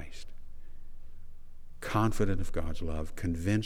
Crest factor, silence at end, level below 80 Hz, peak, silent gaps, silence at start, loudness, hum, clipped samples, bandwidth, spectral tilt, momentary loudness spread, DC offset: 16 dB; 0 s; -38 dBFS; -14 dBFS; none; 0 s; -33 LUFS; none; under 0.1%; 12.5 kHz; -6.5 dB/octave; 26 LU; under 0.1%